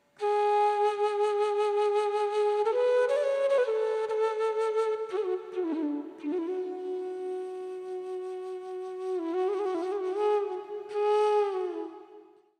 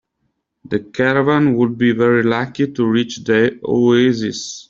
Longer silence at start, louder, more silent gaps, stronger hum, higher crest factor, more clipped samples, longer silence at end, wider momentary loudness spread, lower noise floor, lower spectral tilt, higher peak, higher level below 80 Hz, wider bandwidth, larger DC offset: second, 0.2 s vs 0.7 s; second, -29 LUFS vs -16 LUFS; neither; neither; about the same, 12 dB vs 14 dB; neither; first, 0.35 s vs 0.1 s; first, 12 LU vs 8 LU; second, -54 dBFS vs -70 dBFS; second, -3.5 dB/octave vs -6 dB/octave; second, -16 dBFS vs -2 dBFS; second, -88 dBFS vs -56 dBFS; first, 10 kHz vs 7.6 kHz; neither